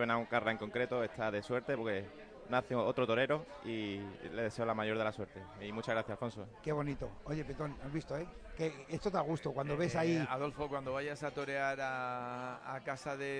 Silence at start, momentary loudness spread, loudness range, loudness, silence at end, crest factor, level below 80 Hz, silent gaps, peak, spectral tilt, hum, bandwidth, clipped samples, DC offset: 0 s; 10 LU; 4 LU; -38 LUFS; 0 s; 20 dB; -60 dBFS; none; -18 dBFS; -6 dB/octave; none; 10.5 kHz; under 0.1%; under 0.1%